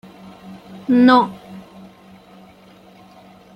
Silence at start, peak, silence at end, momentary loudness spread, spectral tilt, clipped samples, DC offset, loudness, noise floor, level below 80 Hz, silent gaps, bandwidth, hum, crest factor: 0.5 s; -2 dBFS; 1.95 s; 28 LU; -6.5 dB/octave; under 0.1%; under 0.1%; -14 LUFS; -46 dBFS; -62 dBFS; none; 5.8 kHz; none; 20 dB